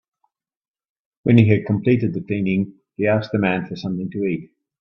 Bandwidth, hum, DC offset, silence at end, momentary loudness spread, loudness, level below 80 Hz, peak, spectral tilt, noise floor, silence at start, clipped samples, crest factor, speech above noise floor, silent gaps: 6 kHz; none; under 0.1%; 0.35 s; 11 LU; -20 LUFS; -56 dBFS; 0 dBFS; -9.5 dB/octave; -71 dBFS; 1.25 s; under 0.1%; 20 dB; 53 dB; none